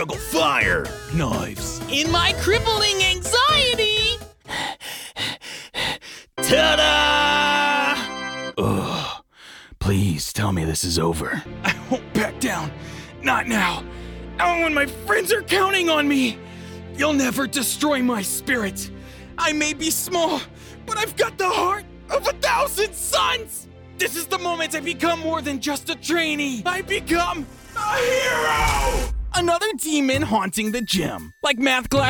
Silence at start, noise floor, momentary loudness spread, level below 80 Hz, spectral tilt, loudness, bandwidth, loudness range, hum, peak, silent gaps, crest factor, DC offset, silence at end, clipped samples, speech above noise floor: 0 s; -45 dBFS; 12 LU; -38 dBFS; -3 dB/octave; -21 LUFS; 19.5 kHz; 5 LU; none; -4 dBFS; none; 18 dB; under 0.1%; 0 s; under 0.1%; 24 dB